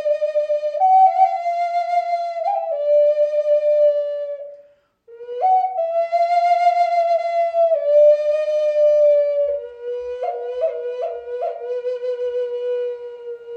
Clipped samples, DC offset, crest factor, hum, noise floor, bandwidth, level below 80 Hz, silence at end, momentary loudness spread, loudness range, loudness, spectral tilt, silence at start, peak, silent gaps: under 0.1%; under 0.1%; 14 dB; none; -52 dBFS; 6.6 kHz; -68 dBFS; 0 s; 13 LU; 8 LU; -19 LUFS; -1.5 dB/octave; 0 s; -4 dBFS; none